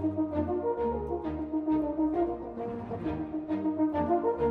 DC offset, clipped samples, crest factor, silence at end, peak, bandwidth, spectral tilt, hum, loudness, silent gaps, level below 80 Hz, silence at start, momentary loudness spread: under 0.1%; under 0.1%; 14 dB; 0 s; -16 dBFS; 4.3 kHz; -10.5 dB/octave; none; -31 LUFS; none; -50 dBFS; 0 s; 7 LU